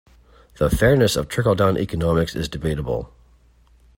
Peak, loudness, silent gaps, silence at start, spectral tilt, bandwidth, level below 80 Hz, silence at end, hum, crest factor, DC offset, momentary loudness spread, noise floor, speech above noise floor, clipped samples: -4 dBFS; -20 LUFS; none; 0.6 s; -6 dB/octave; 16.5 kHz; -36 dBFS; 0.9 s; none; 18 dB; under 0.1%; 10 LU; -54 dBFS; 34 dB; under 0.1%